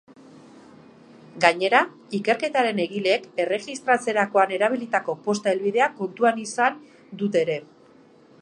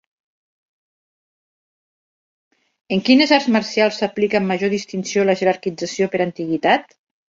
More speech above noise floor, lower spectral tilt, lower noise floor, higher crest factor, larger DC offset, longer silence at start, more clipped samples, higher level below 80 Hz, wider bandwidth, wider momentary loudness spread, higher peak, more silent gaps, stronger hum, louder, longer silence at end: second, 30 dB vs over 72 dB; about the same, -4 dB/octave vs -5 dB/octave; second, -53 dBFS vs under -90 dBFS; first, 24 dB vs 18 dB; neither; second, 1.35 s vs 2.9 s; neither; second, -78 dBFS vs -64 dBFS; first, 11.5 kHz vs 7.8 kHz; about the same, 7 LU vs 8 LU; about the same, 0 dBFS vs -2 dBFS; neither; neither; second, -23 LUFS vs -18 LUFS; first, 0.8 s vs 0.45 s